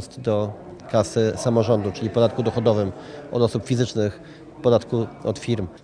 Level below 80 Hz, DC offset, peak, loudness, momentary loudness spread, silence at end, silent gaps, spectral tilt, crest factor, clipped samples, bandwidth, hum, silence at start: -52 dBFS; under 0.1%; -4 dBFS; -23 LUFS; 9 LU; 0.05 s; none; -6.5 dB/octave; 18 dB; under 0.1%; 10.5 kHz; none; 0 s